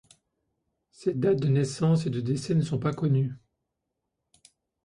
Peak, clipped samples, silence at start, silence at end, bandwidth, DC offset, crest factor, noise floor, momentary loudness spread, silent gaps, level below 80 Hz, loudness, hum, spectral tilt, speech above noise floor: -12 dBFS; under 0.1%; 1 s; 1.5 s; 11 kHz; under 0.1%; 16 dB; -83 dBFS; 7 LU; none; -62 dBFS; -27 LUFS; none; -7.5 dB/octave; 57 dB